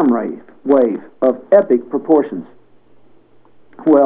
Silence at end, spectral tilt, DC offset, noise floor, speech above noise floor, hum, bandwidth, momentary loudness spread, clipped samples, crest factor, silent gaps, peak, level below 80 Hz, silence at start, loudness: 0 s; -11.5 dB/octave; 0.5%; -51 dBFS; 36 dB; none; 4 kHz; 14 LU; under 0.1%; 16 dB; none; 0 dBFS; -68 dBFS; 0 s; -15 LUFS